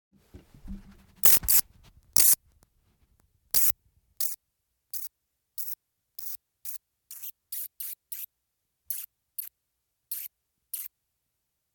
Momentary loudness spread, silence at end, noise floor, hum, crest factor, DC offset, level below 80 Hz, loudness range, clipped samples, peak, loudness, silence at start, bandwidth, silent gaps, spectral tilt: 24 LU; 0.85 s; -81 dBFS; none; 28 dB; under 0.1%; -56 dBFS; 16 LU; under 0.1%; -4 dBFS; -24 LUFS; 0.35 s; 19 kHz; none; 0.5 dB/octave